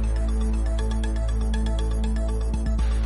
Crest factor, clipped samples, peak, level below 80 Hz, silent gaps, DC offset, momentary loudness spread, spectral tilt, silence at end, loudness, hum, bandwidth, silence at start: 8 dB; under 0.1%; -14 dBFS; -24 dBFS; none; under 0.1%; 1 LU; -6.5 dB/octave; 0 s; -26 LUFS; none; 11.5 kHz; 0 s